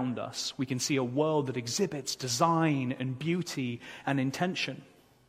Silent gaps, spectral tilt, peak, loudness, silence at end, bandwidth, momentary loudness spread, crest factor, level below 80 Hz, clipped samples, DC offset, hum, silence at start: none; -4.5 dB/octave; -12 dBFS; -31 LUFS; 0.45 s; 16 kHz; 8 LU; 20 dB; -70 dBFS; under 0.1%; under 0.1%; none; 0 s